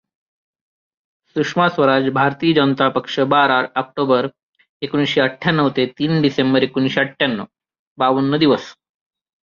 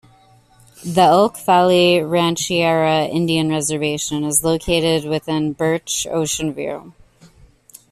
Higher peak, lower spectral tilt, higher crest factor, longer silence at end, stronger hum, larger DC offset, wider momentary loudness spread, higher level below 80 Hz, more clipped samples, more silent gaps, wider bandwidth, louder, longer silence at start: about the same, -2 dBFS vs -2 dBFS; first, -6.5 dB/octave vs -4 dB/octave; about the same, 16 dB vs 16 dB; second, 0.85 s vs 1 s; neither; neither; about the same, 8 LU vs 9 LU; second, -60 dBFS vs -46 dBFS; neither; first, 4.43-4.53 s, 4.69-4.80 s, 7.79-7.96 s vs none; second, 7.2 kHz vs 14.5 kHz; about the same, -17 LUFS vs -17 LUFS; first, 1.35 s vs 0.8 s